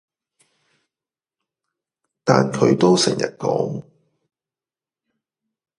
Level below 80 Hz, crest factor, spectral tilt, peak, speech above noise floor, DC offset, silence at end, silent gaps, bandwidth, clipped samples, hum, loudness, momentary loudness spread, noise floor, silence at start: -64 dBFS; 22 dB; -5 dB/octave; 0 dBFS; over 72 dB; under 0.1%; 2 s; none; 11.5 kHz; under 0.1%; none; -18 LUFS; 11 LU; under -90 dBFS; 2.25 s